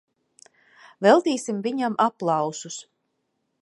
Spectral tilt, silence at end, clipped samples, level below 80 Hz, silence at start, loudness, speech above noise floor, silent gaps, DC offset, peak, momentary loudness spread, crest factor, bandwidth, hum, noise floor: -4.5 dB/octave; 0.8 s; under 0.1%; -82 dBFS; 1 s; -22 LUFS; 53 dB; none; under 0.1%; -2 dBFS; 16 LU; 22 dB; 11.5 kHz; none; -75 dBFS